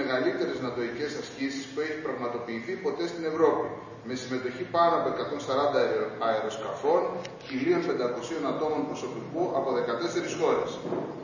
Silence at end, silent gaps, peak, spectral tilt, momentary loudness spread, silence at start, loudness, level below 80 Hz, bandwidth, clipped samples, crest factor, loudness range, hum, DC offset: 0 s; none; -10 dBFS; -5 dB/octave; 9 LU; 0 s; -29 LUFS; -66 dBFS; 7.4 kHz; under 0.1%; 20 dB; 3 LU; none; under 0.1%